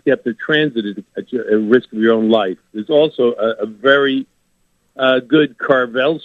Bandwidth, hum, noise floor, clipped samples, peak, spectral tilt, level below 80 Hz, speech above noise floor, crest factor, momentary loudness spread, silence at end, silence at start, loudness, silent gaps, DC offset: 6.8 kHz; none; -62 dBFS; under 0.1%; 0 dBFS; -7 dB/octave; -66 dBFS; 46 dB; 16 dB; 11 LU; 0.05 s; 0.05 s; -16 LUFS; none; under 0.1%